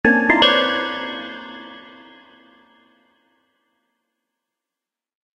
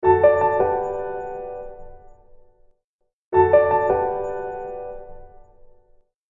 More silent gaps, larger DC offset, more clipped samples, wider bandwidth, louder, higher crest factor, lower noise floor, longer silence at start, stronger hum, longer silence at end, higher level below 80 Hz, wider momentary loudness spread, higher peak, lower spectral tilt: second, none vs 2.84-2.99 s, 3.13-3.31 s; neither; neither; first, 11 kHz vs 7.2 kHz; first, -17 LUFS vs -20 LUFS; about the same, 24 dB vs 20 dB; first, -88 dBFS vs -74 dBFS; about the same, 0.05 s vs 0 s; neither; first, 3.55 s vs 1 s; second, -54 dBFS vs -48 dBFS; first, 24 LU vs 19 LU; first, 0 dBFS vs -4 dBFS; second, -4.5 dB/octave vs -9 dB/octave